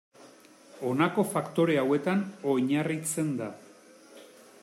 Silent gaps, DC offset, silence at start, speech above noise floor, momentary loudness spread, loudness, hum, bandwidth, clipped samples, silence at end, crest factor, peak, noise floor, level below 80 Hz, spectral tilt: none; under 0.1%; 0.2 s; 26 dB; 7 LU; -28 LUFS; none; 16 kHz; under 0.1%; 0.4 s; 18 dB; -12 dBFS; -54 dBFS; -76 dBFS; -5.5 dB/octave